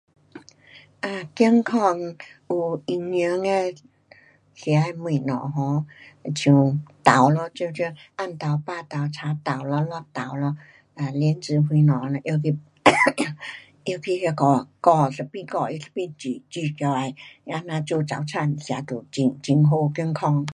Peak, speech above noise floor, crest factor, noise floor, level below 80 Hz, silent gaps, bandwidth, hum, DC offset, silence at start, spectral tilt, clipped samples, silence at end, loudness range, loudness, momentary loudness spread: 0 dBFS; 31 dB; 24 dB; -54 dBFS; -66 dBFS; none; 11 kHz; none; under 0.1%; 0.35 s; -6.5 dB/octave; under 0.1%; 0 s; 6 LU; -23 LUFS; 13 LU